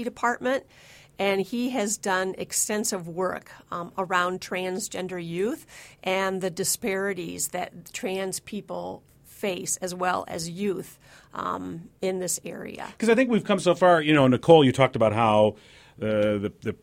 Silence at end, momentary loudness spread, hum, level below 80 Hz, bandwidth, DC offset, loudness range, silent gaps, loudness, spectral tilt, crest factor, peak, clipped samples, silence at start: 0.1 s; 15 LU; none; -60 dBFS; 16.5 kHz; under 0.1%; 10 LU; none; -25 LUFS; -4.5 dB/octave; 22 dB; -2 dBFS; under 0.1%; 0 s